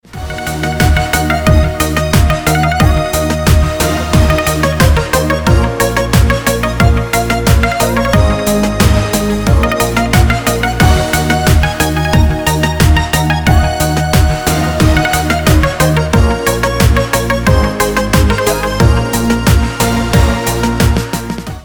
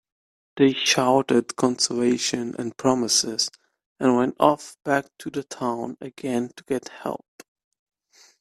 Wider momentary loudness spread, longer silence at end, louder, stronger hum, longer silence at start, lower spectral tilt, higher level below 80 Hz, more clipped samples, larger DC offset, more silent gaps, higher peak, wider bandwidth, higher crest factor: second, 3 LU vs 13 LU; second, 0 s vs 1.25 s; first, -12 LUFS vs -23 LUFS; neither; second, 0.1 s vs 0.55 s; first, -5 dB/octave vs -3.5 dB/octave; first, -18 dBFS vs -66 dBFS; neither; first, 0.8% vs under 0.1%; second, none vs 3.86-3.95 s; about the same, 0 dBFS vs -2 dBFS; first, over 20 kHz vs 14 kHz; second, 10 dB vs 22 dB